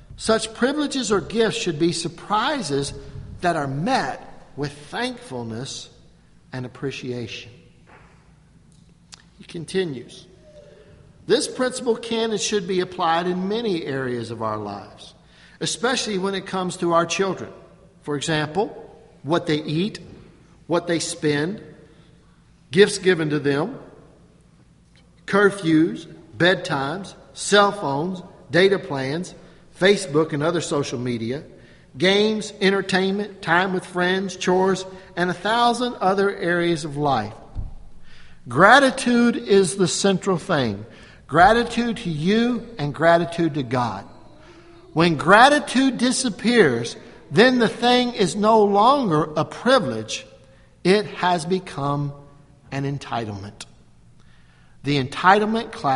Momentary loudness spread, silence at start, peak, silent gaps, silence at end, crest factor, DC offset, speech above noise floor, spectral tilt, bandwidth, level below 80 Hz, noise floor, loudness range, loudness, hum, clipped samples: 16 LU; 0.1 s; 0 dBFS; none; 0 s; 22 dB; under 0.1%; 33 dB; -4.5 dB/octave; 11.5 kHz; -50 dBFS; -53 dBFS; 11 LU; -21 LUFS; none; under 0.1%